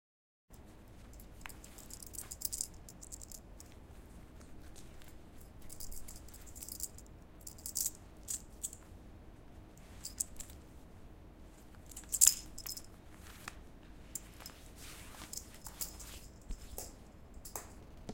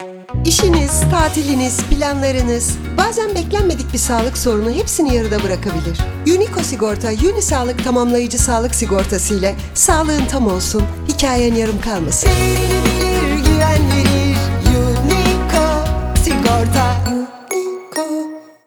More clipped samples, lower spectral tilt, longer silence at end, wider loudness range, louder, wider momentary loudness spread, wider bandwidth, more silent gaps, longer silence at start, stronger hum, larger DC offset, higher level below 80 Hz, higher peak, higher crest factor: neither; second, -1 dB/octave vs -4.5 dB/octave; second, 0 s vs 0.25 s; first, 15 LU vs 2 LU; second, -39 LUFS vs -15 LUFS; first, 19 LU vs 6 LU; second, 17 kHz vs over 20 kHz; neither; first, 0.5 s vs 0 s; neither; neither; second, -56 dBFS vs -22 dBFS; about the same, -4 dBFS vs -2 dBFS; first, 40 dB vs 14 dB